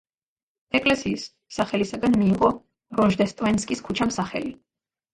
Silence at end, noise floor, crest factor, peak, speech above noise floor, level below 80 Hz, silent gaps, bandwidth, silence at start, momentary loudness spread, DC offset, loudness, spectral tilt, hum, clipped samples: 0.6 s; under -90 dBFS; 18 dB; -6 dBFS; over 67 dB; -52 dBFS; none; 11.5 kHz; 0.75 s; 11 LU; under 0.1%; -23 LUFS; -5.5 dB/octave; none; under 0.1%